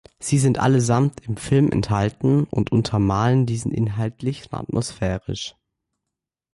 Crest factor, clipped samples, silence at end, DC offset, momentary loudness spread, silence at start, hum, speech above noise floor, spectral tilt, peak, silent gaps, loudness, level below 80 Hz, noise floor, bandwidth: 14 dB; under 0.1%; 1.05 s; under 0.1%; 10 LU; 0.2 s; none; 64 dB; -6.5 dB/octave; -8 dBFS; none; -21 LUFS; -44 dBFS; -84 dBFS; 11.5 kHz